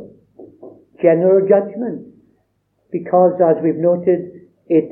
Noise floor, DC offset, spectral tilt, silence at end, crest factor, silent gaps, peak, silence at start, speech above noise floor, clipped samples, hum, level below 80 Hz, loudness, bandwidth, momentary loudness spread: -65 dBFS; under 0.1%; -13 dB/octave; 0 s; 16 dB; none; 0 dBFS; 0 s; 50 dB; under 0.1%; none; -68 dBFS; -16 LUFS; 3.1 kHz; 15 LU